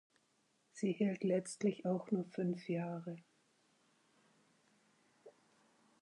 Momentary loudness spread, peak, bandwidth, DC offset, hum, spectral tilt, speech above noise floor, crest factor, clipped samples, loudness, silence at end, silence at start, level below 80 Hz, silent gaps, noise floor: 12 LU; -24 dBFS; 11 kHz; under 0.1%; none; -7 dB/octave; 39 dB; 18 dB; under 0.1%; -39 LUFS; 0.7 s; 0.75 s; under -90 dBFS; none; -77 dBFS